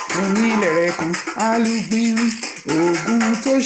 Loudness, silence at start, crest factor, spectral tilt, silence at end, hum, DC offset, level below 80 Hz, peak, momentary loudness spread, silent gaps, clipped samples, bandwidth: -19 LUFS; 0 s; 14 dB; -4.5 dB/octave; 0 s; none; under 0.1%; -58 dBFS; -6 dBFS; 5 LU; none; under 0.1%; 9 kHz